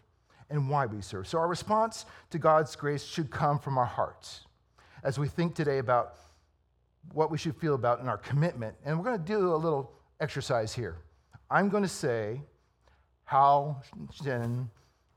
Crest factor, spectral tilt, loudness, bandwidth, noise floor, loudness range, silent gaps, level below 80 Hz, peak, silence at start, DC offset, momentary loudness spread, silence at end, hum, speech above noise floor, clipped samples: 20 dB; -6.5 dB/octave; -30 LUFS; 14 kHz; -71 dBFS; 3 LU; none; -64 dBFS; -10 dBFS; 0.5 s; under 0.1%; 14 LU; 0.45 s; none; 41 dB; under 0.1%